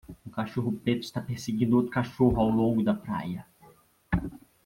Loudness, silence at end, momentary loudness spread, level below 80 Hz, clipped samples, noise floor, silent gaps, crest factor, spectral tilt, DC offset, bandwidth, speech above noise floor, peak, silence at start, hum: -28 LUFS; 0.3 s; 12 LU; -46 dBFS; under 0.1%; -58 dBFS; none; 18 dB; -7.5 dB/octave; under 0.1%; 16 kHz; 31 dB; -10 dBFS; 0.1 s; none